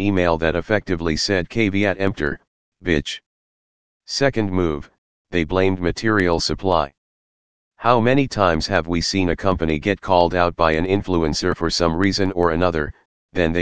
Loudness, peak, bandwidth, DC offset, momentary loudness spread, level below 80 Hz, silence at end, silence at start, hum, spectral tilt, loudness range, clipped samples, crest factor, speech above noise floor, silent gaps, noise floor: -20 LUFS; 0 dBFS; 10 kHz; 2%; 8 LU; -38 dBFS; 0 s; 0 s; none; -5.5 dB/octave; 4 LU; under 0.1%; 20 dB; over 71 dB; 2.47-2.72 s, 3.26-4.00 s, 4.98-5.25 s, 6.98-7.71 s, 13.05-13.29 s; under -90 dBFS